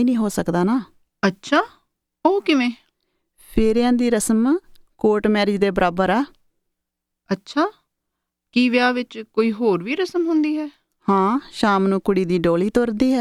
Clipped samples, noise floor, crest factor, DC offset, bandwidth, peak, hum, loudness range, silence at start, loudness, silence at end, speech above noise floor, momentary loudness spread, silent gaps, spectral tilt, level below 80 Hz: under 0.1%; -81 dBFS; 16 dB; under 0.1%; 14 kHz; -4 dBFS; none; 3 LU; 0 s; -20 LUFS; 0 s; 62 dB; 7 LU; none; -5.5 dB/octave; -44 dBFS